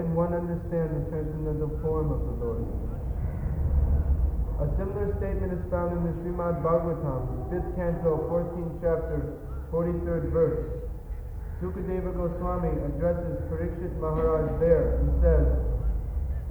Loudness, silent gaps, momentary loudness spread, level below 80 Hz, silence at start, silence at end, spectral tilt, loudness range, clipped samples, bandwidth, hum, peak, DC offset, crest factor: -29 LUFS; none; 8 LU; -32 dBFS; 0 s; 0 s; -11 dB/octave; 4 LU; under 0.1%; over 20 kHz; none; -10 dBFS; under 0.1%; 18 dB